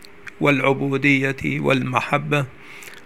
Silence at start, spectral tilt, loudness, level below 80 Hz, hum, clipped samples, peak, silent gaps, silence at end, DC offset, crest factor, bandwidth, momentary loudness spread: 0.25 s; -6.5 dB/octave; -20 LUFS; -56 dBFS; none; under 0.1%; 0 dBFS; none; 0.05 s; 0.6%; 20 dB; 15 kHz; 17 LU